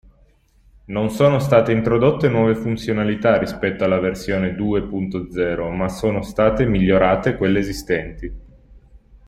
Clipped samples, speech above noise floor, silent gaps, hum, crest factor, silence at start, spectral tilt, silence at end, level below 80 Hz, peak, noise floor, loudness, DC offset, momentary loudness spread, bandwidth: under 0.1%; 36 dB; none; none; 18 dB; 0.9 s; -7 dB/octave; 0.1 s; -38 dBFS; -2 dBFS; -55 dBFS; -19 LUFS; under 0.1%; 8 LU; 15.5 kHz